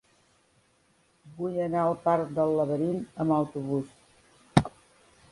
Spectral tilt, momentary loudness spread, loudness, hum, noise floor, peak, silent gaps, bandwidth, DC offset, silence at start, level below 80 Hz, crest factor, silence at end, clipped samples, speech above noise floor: -7.5 dB/octave; 7 LU; -28 LUFS; none; -66 dBFS; -2 dBFS; none; 11.5 kHz; under 0.1%; 1.25 s; -56 dBFS; 26 dB; 0.65 s; under 0.1%; 39 dB